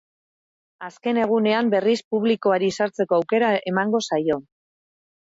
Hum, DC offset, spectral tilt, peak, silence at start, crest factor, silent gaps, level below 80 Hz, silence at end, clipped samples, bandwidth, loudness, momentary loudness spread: none; under 0.1%; -5.5 dB/octave; -8 dBFS; 0.8 s; 14 dB; 2.04-2.11 s; -68 dBFS; 0.8 s; under 0.1%; 8 kHz; -21 LUFS; 7 LU